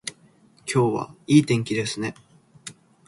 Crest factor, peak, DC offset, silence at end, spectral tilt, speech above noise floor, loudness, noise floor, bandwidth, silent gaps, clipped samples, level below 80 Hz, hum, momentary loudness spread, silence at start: 20 dB; -4 dBFS; under 0.1%; 0.35 s; -5.5 dB/octave; 35 dB; -23 LUFS; -56 dBFS; 11.5 kHz; none; under 0.1%; -62 dBFS; none; 23 LU; 0.05 s